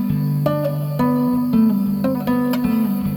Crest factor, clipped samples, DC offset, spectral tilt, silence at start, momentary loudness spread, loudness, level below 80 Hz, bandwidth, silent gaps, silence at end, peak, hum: 14 dB; under 0.1%; under 0.1%; -8.5 dB/octave; 0 s; 4 LU; -19 LUFS; -46 dBFS; over 20 kHz; none; 0 s; -4 dBFS; none